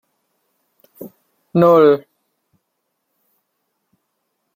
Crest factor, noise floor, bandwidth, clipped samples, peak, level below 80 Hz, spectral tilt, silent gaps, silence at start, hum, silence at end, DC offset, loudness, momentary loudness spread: 18 dB; -73 dBFS; 16 kHz; under 0.1%; -2 dBFS; -64 dBFS; -9 dB/octave; none; 1 s; none; 2.55 s; under 0.1%; -13 LUFS; 28 LU